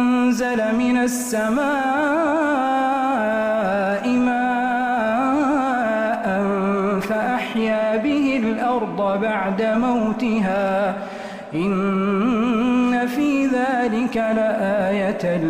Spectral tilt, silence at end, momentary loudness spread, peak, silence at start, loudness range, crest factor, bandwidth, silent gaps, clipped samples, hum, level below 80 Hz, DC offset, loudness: -6 dB/octave; 0 s; 3 LU; -10 dBFS; 0 s; 1 LU; 10 dB; 15.5 kHz; none; under 0.1%; none; -52 dBFS; under 0.1%; -20 LUFS